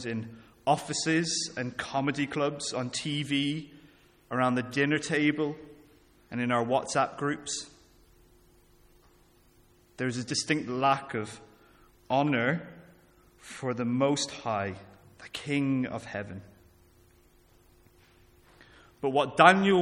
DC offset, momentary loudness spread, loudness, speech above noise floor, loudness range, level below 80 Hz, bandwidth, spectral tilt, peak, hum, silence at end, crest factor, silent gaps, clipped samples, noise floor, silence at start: under 0.1%; 13 LU; -29 LUFS; 33 dB; 7 LU; -66 dBFS; 13.5 kHz; -4.5 dB/octave; -2 dBFS; none; 0 s; 28 dB; none; under 0.1%; -61 dBFS; 0 s